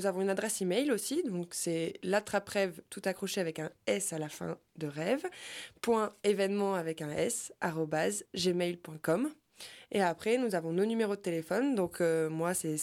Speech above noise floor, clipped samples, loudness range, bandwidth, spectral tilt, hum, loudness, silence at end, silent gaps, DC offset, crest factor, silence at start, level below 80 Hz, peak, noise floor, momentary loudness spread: 20 dB; under 0.1%; 3 LU; 16.5 kHz; -4.5 dB/octave; none; -33 LUFS; 0 s; none; under 0.1%; 14 dB; 0 s; -74 dBFS; -18 dBFS; -52 dBFS; 8 LU